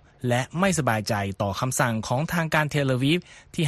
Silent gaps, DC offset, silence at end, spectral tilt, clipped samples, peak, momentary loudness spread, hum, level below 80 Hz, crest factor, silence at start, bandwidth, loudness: none; under 0.1%; 0 s; -5 dB/octave; under 0.1%; -6 dBFS; 4 LU; none; -52 dBFS; 18 dB; 0.2 s; 13 kHz; -24 LUFS